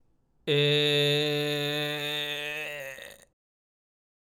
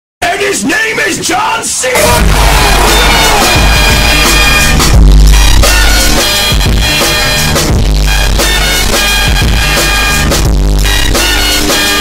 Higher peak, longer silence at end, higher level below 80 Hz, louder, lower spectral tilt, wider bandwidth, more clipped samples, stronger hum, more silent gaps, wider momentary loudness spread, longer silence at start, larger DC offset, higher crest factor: second, -14 dBFS vs 0 dBFS; first, 1.2 s vs 0 s; second, -72 dBFS vs -10 dBFS; second, -26 LUFS vs -7 LUFS; first, -4.5 dB/octave vs -3 dB/octave; about the same, 17.5 kHz vs 16.5 kHz; second, under 0.1% vs 0.4%; neither; neither; first, 17 LU vs 5 LU; first, 0.45 s vs 0.2 s; neither; first, 16 dB vs 6 dB